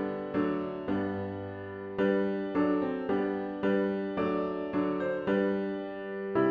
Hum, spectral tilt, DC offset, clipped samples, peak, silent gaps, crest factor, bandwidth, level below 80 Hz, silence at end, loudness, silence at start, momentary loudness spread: none; -9 dB/octave; under 0.1%; under 0.1%; -16 dBFS; none; 16 dB; 5.2 kHz; -64 dBFS; 0 s; -31 LUFS; 0 s; 8 LU